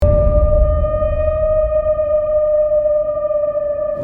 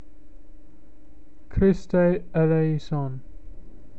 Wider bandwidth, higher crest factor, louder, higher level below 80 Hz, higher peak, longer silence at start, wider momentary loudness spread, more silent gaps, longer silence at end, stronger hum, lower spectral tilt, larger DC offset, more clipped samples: second, 3.3 kHz vs 7.6 kHz; about the same, 14 dB vs 16 dB; first, -16 LUFS vs -23 LUFS; first, -20 dBFS vs -40 dBFS; first, -2 dBFS vs -10 dBFS; second, 0 s vs 0.35 s; second, 4 LU vs 12 LU; neither; second, 0 s vs 0.2 s; neither; first, -11 dB/octave vs -9.5 dB/octave; second, under 0.1% vs 2%; neither